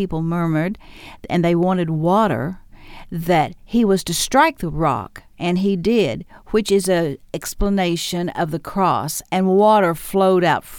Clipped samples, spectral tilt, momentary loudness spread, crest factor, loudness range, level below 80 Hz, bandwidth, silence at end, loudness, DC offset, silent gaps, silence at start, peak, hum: under 0.1%; -5.5 dB/octave; 11 LU; 16 dB; 2 LU; -38 dBFS; 18.5 kHz; 0 s; -19 LUFS; under 0.1%; none; 0 s; -2 dBFS; none